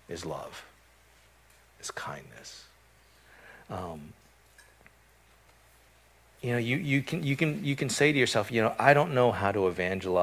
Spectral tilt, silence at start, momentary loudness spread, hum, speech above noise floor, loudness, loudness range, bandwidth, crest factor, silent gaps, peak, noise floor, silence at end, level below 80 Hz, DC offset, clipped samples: -5 dB/octave; 0.1 s; 22 LU; none; 33 dB; -28 LUFS; 21 LU; 16 kHz; 24 dB; none; -6 dBFS; -61 dBFS; 0 s; -58 dBFS; under 0.1%; under 0.1%